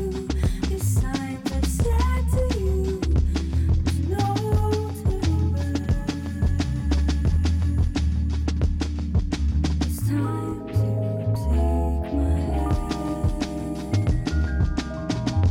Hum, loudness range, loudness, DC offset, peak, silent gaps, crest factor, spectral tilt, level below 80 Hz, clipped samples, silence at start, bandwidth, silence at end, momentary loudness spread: none; 1 LU; -24 LUFS; under 0.1%; -12 dBFS; none; 10 dB; -7 dB/octave; -26 dBFS; under 0.1%; 0 s; 16 kHz; 0 s; 4 LU